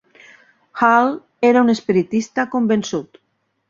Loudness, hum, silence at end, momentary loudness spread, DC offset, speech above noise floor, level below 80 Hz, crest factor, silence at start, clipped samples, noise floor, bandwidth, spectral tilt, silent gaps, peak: -17 LUFS; none; 0.7 s; 10 LU; under 0.1%; 33 dB; -62 dBFS; 16 dB; 0.75 s; under 0.1%; -49 dBFS; 7.6 kHz; -5.5 dB/octave; none; -2 dBFS